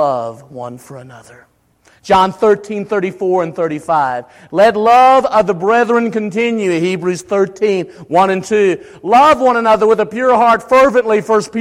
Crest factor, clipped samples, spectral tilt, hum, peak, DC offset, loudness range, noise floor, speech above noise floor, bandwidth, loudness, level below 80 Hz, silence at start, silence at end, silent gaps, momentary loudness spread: 12 dB; under 0.1%; -5.5 dB/octave; none; -2 dBFS; under 0.1%; 5 LU; -52 dBFS; 39 dB; 14.5 kHz; -13 LUFS; -50 dBFS; 0 s; 0 s; none; 11 LU